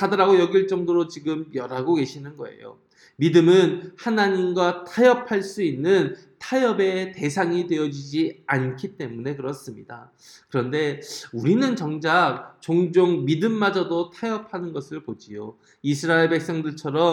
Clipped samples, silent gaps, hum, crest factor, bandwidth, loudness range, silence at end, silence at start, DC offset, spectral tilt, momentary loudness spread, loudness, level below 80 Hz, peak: under 0.1%; none; none; 18 dB; 12 kHz; 6 LU; 0 s; 0 s; under 0.1%; -6 dB/octave; 17 LU; -22 LUFS; -72 dBFS; -4 dBFS